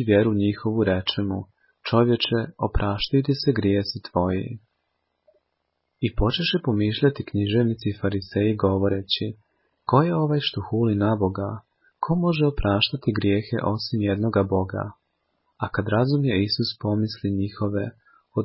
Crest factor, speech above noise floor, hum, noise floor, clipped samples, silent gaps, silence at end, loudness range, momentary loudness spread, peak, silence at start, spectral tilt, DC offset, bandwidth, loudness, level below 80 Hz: 18 dB; 54 dB; none; -76 dBFS; under 0.1%; none; 0 s; 3 LU; 9 LU; -4 dBFS; 0 s; -10.5 dB/octave; under 0.1%; 5.8 kHz; -23 LUFS; -42 dBFS